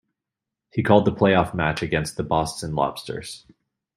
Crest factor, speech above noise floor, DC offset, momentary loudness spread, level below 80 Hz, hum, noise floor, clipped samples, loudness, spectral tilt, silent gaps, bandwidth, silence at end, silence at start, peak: 22 dB; 64 dB; under 0.1%; 15 LU; -48 dBFS; none; -86 dBFS; under 0.1%; -22 LUFS; -6 dB/octave; none; 16 kHz; 0.6 s; 0.75 s; -2 dBFS